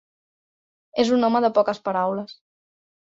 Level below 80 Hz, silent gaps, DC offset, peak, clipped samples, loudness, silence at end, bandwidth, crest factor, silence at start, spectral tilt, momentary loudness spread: -66 dBFS; none; under 0.1%; -6 dBFS; under 0.1%; -22 LUFS; 0.8 s; 7.8 kHz; 18 dB; 0.95 s; -5.5 dB/octave; 12 LU